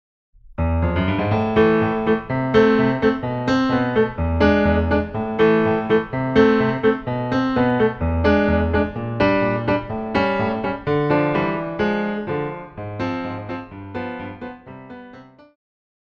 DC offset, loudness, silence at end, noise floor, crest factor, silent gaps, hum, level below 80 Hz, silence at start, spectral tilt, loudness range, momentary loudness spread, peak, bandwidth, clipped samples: under 0.1%; -20 LUFS; 0.8 s; -43 dBFS; 18 dB; none; none; -36 dBFS; 0.5 s; -8 dB/octave; 8 LU; 14 LU; -2 dBFS; 6.8 kHz; under 0.1%